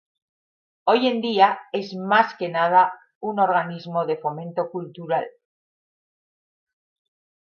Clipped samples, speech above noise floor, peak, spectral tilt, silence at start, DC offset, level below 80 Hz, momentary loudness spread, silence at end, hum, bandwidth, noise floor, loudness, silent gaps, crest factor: under 0.1%; over 69 dB; -4 dBFS; -6.5 dB/octave; 0.85 s; under 0.1%; -78 dBFS; 11 LU; 2.15 s; none; 6.8 kHz; under -90 dBFS; -22 LUFS; 3.15-3.21 s; 20 dB